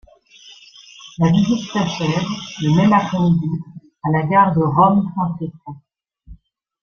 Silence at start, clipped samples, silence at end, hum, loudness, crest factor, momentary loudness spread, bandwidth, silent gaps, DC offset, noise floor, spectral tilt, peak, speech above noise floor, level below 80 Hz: 0.45 s; under 0.1%; 0.5 s; none; -17 LUFS; 16 dB; 17 LU; 7 kHz; none; under 0.1%; -46 dBFS; -7 dB/octave; -2 dBFS; 29 dB; -50 dBFS